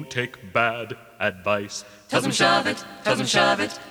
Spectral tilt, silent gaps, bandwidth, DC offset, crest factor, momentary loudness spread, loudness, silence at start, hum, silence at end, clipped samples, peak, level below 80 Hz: -3 dB/octave; none; over 20 kHz; under 0.1%; 18 dB; 12 LU; -23 LUFS; 0 s; none; 0 s; under 0.1%; -6 dBFS; -60 dBFS